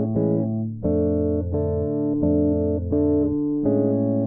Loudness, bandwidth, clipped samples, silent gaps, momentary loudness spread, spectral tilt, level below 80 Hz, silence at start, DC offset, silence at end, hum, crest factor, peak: -22 LUFS; 1.9 kHz; under 0.1%; none; 4 LU; -16 dB/octave; -40 dBFS; 0 s; under 0.1%; 0 s; none; 12 dB; -8 dBFS